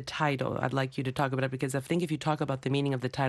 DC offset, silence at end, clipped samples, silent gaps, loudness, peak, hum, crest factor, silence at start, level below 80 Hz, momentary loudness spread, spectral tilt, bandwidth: under 0.1%; 0 s; under 0.1%; none; -31 LUFS; -14 dBFS; none; 16 dB; 0 s; -62 dBFS; 2 LU; -6 dB/octave; 12.5 kHz